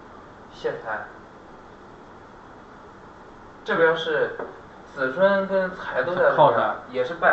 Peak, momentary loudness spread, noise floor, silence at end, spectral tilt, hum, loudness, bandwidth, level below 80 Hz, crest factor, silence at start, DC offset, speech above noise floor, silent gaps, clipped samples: -4 dBFS; 27 LU; -45 dBFS; 0 s; -6 dB/octave; none; -23 LUFS; 7.6 kHz; -58 dBFS; 20 dB; 0 s; under 0.1%; 23 dB; none; under 0.1%